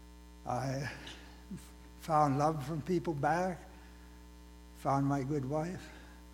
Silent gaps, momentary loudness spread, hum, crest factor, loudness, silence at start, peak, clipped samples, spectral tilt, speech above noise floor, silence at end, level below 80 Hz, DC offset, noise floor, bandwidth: none; 24 LU; 60 Hz at -55 dBFS; 20 dB; -34 LUFS; 0 s; -16 dBFS; under 0.1%; -7 dB/octave; 20 dB; 0 s; -56 dBFS; under 0.1%; -53 dBFS; 16.5 kHz